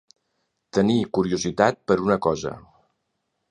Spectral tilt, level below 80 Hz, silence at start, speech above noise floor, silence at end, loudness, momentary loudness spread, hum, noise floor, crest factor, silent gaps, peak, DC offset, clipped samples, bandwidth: -5.5 dB/octave; -54 dBFS; 0.75 s; 55 dB; 0.9 s; -22 LUFS; 9 LU; none; -76 dBFS; 22 dB; none; -2 dBFS; under 0.1%; under 0.1%; 10.5 kHz